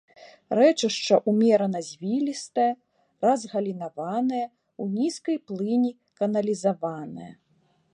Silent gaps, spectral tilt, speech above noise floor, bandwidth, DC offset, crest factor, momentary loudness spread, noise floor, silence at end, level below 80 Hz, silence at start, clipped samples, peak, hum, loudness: none; -5.5 dB/octave; 42 dB; 11 kHz; under 0.1%; 18 dB; 13 LU; -66 dBFS; 0.6 s; -76 dBFS; 0.2 s; under 0.1%; -6 dBFS; none; -25 LUFS